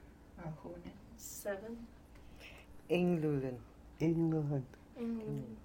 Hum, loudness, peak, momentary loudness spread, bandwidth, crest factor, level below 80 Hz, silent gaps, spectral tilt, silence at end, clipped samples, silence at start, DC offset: none; -38 LUFS; -20 dBFS; 22 LU; 17 kHz; 20 dB; -60 dBFS; none; -7 dB/octave; 0 s; under 0.1%; 0 s; under 0.1%